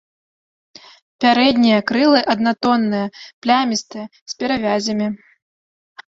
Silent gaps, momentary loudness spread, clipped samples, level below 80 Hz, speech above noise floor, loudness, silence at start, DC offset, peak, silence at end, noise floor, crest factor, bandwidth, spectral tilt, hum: 3.33-3.42 s, 4.22-4.26 s, 5.42-5.96 s; 14 LU; under 0.1%; -58 dBFS; over 73 dB; -17 LUFS; 1.2 s; under 0.1%; -2 dBFS; 0.1 s; under -90 dBFS; 18 dB; 7.8 kHz; -4.5 dB/octave; none